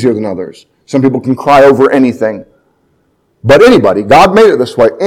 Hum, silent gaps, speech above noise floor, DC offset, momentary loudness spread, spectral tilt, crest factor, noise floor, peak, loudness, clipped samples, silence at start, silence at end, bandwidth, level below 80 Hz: none; none; 48 dB; under 0.1%; 15 LU; -6 dB/octave; 8 dB; -55 dBFS; 0 dBFS; -7 LUFS; 4%; 0 s; 0 s; 17 kHz; -40 dBFS